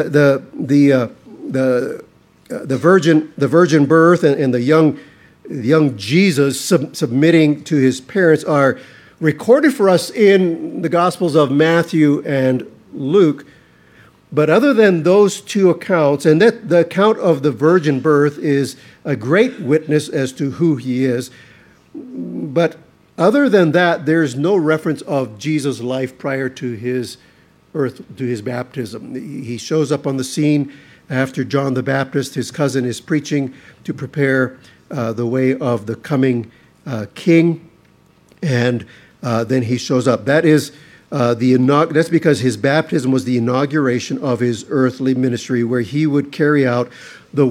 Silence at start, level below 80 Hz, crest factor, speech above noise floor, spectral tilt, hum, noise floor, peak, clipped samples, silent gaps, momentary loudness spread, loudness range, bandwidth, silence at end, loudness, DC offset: 0 s; -64 dBFS; 16 dB; 36 dB; -6.5 dB/octave; none; -51 dBFS; 0 dBFS; under 0.1%; none; 14 LU; 6 LU; 15.5 kHz; 0 s; -16 LUFS; under 0.1%